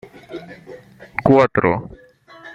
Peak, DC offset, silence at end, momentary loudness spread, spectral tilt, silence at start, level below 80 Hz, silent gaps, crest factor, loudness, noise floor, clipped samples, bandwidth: -2 dBFS; under 0.1%; 0 s; 25 LU; -8.5 dB/octave; 0.3 s; -50 dBFS; none; 18 dB; -17 LUFS; -43 dBFS; under 0.1%; 7.8 kHz